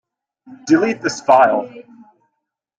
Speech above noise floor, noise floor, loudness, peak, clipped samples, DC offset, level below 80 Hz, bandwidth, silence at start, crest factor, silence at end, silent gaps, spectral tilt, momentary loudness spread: 60 dB; -76 dBFS; -15 LUFS; -2 dBFS; under 0.1%; under 0.1%; -64 dBFS; 9 kHz; 0.5 s; 16 dB; 1 s; none; -4.5 dB/octave; 18 LU